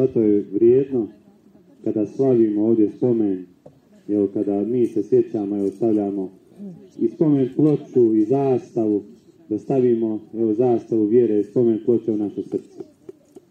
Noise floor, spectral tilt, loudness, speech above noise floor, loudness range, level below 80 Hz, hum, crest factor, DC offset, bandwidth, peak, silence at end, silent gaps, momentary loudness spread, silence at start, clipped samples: -51 dBFS; -10.5 dB/octave; -20 LUFS; 32 dB; 2 LU; -68 dBFS; none; 14 dB; under 0.1%; 6.6 kHz; -6 dBFS; 0.4 s; none; 12 LU; 0 s; under 0.1%